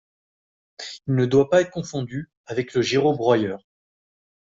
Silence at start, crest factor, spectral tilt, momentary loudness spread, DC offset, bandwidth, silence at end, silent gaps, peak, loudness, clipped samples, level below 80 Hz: 0.8 s; 18 dB; -6 dB/octave; 16 LU; under 0.1%; 7.8 kHz; 0.95 s; 2.37-2.44 s; -4 dBFS; -22 LUFS; under 0.1%; -60 dBFS